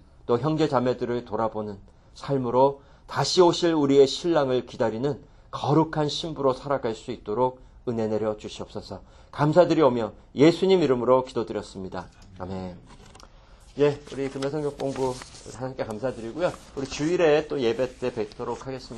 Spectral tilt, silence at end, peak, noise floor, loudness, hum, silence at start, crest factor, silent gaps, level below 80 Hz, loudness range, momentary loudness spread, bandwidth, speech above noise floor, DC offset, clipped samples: -6 dB/octave; 0 s; -4 dBFS; -50 dBFS; -25 LUFS; none; 0.3 s; 22 dB; none; -52 dBFS; 8 LU; 17 LU; 11.5 kHz; 26 dB; under 0.1%; under 0.1%